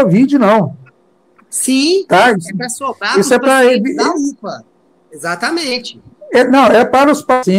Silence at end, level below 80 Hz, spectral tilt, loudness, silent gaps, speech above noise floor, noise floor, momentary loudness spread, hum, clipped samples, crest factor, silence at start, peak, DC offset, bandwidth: 0 s; -56 dBFS; -4.5 dB/octave; -12 LUFS; none; 41 dB; -52 dBFS; 13 LU; none; under 0.1%; 12 dB; 0 s; 0 dBFS; under 0.1%; 16 kHz